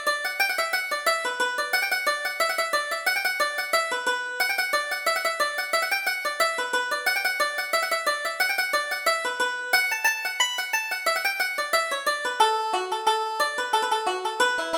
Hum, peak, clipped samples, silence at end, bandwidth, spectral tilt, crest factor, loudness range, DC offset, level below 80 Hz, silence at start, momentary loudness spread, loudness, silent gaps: none; -6 dBFS; under 0.1%; 0 s; over 20 kHz; 1.5 dB/octave; 18 dB; 1 LU; under 0.1%; -68 dBFS; 0 s; 3 LU; -24 LUFS; none